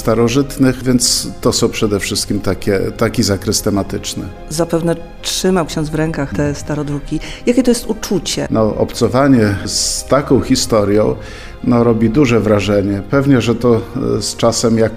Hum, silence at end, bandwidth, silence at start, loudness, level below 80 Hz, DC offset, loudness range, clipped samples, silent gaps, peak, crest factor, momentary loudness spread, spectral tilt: none; 0 s; 16 kHz; 0 s; -15 LUFS; -32 dBFS; under 0.1%; 4 LU; under 0.1%; none; 0 dBFS; 14 dB; 8 LU; -5 dB/octave